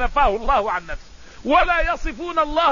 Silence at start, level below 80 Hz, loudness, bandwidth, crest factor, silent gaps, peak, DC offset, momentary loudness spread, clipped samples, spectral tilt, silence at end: 0 s; -30 dBFS; -20 LUFS; 7.4 kHz; 16 dB; none; -4 dBFS; 0.6%; 14 LU; under 0.1%; -4.5 dB/octave; 0 s